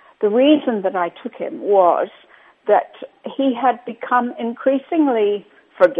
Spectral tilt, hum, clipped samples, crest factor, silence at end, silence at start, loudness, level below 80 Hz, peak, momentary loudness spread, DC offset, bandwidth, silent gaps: -7.5 dB/octave; none; under 0.1%; 18 dB; 0 s; 0.2 s; -18 LUFS; -72 dBFS; 0 dBFS; 14 LU; under 0.1%; 4.7 kHz; none